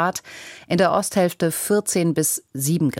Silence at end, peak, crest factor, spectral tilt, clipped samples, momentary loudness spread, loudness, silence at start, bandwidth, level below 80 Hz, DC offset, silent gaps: 0 s; -6 dBFS; 16 dB; -4.5 dB/octave; under 0.1%; 10 LU; -21 LUFS; 0 s; 17 kHz; -60 dBFS; under 0.1%; none